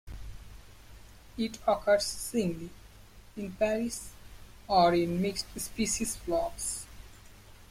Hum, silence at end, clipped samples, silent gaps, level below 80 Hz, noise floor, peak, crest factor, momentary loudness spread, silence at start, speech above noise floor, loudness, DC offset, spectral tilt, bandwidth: none; 0.05 s; under 0.1%; none; -50 dBFS; -53 dBFS; -12 dBFS; 20 dB; 22 LU; 0.05 s; 23 dB; -30 LUFS; under 0.1%; -4 dB/octave; 16.5 kHz